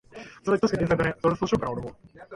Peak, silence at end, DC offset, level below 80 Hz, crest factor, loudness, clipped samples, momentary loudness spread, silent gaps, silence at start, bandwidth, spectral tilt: -10 dBFS; 0 s; under 0.1%; -48 dBFS; 18 dB; -26 LUFS; under 0.1%; 13 LU; none; 0.15 s; 11.5 kHz; -6.5 dB/octave